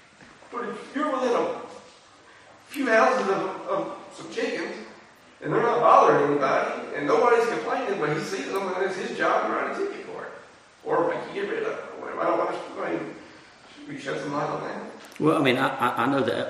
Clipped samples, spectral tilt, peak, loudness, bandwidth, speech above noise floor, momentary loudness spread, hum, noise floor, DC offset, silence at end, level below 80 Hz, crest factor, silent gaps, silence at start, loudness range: under 0.1%; -5 dB/octave; -4 dBFS; -25 LUFS; 13 kHz; 28 dB; 18 LU; none; -52 dBFS; under 0.1%; 0 s; -72 dBFS; 22 dB; none; 0.2 s; 8 LU